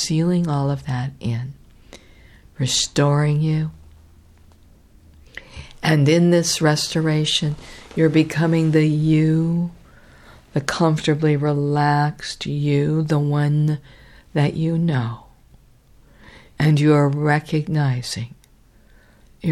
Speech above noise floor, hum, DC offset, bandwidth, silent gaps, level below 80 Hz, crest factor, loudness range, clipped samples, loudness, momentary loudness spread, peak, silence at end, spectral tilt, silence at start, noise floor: 34 dB; none; under 0.1%; 13 kHz; none; -48 dBFS; 18 dB; 4 LU; under 0.1%; -19 LUFS; 12 LU; -2 dBFS; 0 s; -5.5 dB/octave; 0 s; -52 dBFS